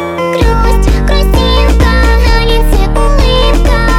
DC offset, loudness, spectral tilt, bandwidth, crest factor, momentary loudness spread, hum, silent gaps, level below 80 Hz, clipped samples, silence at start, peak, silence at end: under 0.1%; -10 LUFS; -5.5 dB/octave; 15 kHz; 8 dB; 3 LU; none; none; -8 dBFS; 0.2%; 0 s; 0 dBFS; 0 s